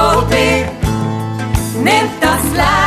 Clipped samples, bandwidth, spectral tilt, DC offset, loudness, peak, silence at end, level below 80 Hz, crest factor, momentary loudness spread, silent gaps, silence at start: under 0.1%; 14 kHz; -4.5 dB/octave; under 0.1%; -14 LUFS; 0 dBFS; 0 s; -26 dBFS; 14 dB; 6 LU; none; 0 s